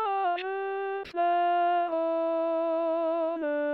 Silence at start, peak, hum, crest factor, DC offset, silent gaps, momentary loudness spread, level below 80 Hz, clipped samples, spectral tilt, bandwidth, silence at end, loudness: 0 s; -18 dBFS; none; 10 dB; under 0.1%; none; 7 LU; -74 dBFS; under 0.1%; -0.5 dB/octave; 5.8 kHz; 0 s; -28 LUFS